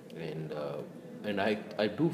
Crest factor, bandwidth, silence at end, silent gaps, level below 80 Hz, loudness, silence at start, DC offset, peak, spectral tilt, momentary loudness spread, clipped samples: 18 dB; 15.5 kHz; 0 s; none; -74 dBFS; -35 LUFS; 0 s; under 0.1%; -16 dBFS; -7 dB/octave; 10 LU; under 0.1%